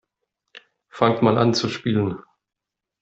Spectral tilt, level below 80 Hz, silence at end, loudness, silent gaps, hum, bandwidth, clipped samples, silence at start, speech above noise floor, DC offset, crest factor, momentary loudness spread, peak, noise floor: -6 dB/octave; -58 dBFS; 0.8 s; -21 LUFS; none; none; 8 kHz; under 0.1%; 0.55 s; 60 dB; under 0.1%; 22 dB; 8 LU; -2 dBFS; -79 dBFS